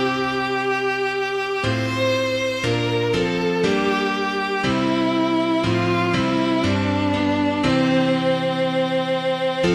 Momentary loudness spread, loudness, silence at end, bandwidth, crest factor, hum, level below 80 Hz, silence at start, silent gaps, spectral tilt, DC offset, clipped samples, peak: 3 LU; -20 LUFS; 0 s; 14 kHz; 14 dB; none; -48 dBFS; 0 s; none; -5.5 dB/octave; under 0.1%; under 0.1%; -6 dBFS